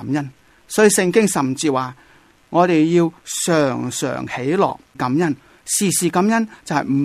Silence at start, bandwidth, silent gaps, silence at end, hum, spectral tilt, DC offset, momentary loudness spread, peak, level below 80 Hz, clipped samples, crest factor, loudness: 0 s; 15.5 kHz; none; 0 s; none; -4.5 dB/octave; under 0.1%; 9 LU; -2 dBFS; -58 dBFS; under 0.1%; 16 dB; -18 LUFS